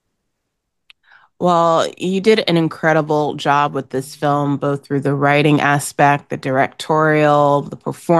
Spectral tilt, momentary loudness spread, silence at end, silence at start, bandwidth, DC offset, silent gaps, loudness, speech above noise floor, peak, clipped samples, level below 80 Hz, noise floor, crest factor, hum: -6 dB/octave; 7 LU; 0 s; 1.4 s; 12.5 kHz; under 0.1%; none; -16 LUFS; 59 dB; -2 dBFS; under 0.1%; -64 dBFS; -74 dBFS; 14 dB; none